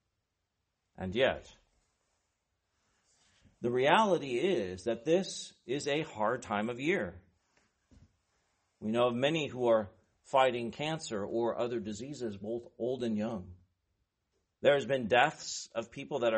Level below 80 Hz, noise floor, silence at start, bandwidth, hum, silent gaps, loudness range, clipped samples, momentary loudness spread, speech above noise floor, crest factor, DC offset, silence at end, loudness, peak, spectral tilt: -68 dBFS; -84 dBFS; 1 s; 8.4 kHz; none; none; 6 LU; under 0.1%; 13 LU; 52 dB; 24 dB; under 0.1%; 0 s; -32 LUFS; -10 dBFS; -4.5 dB/octave